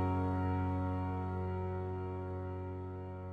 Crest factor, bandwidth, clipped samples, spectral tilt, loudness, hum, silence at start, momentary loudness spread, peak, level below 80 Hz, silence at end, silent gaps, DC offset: 14 dB; 4.5 kHz; under 0.1%; -10 dB/octave; -38 LUFS; none; 0 s; 8 LU; -24 dBFS; -56 dBFS; 0 s; none; under 0.1%